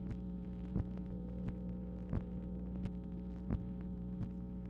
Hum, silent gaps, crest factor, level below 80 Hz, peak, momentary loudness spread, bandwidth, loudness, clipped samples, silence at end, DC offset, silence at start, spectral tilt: 60 Hz at -50 dBFS; none; 18 dB; -48 dBFS; -24 dBFS; 4 LU; 4.5 kHz; -44 LUFS; under 0.1%; 0 s; under 0.1%; 0 s; -11 dB/octave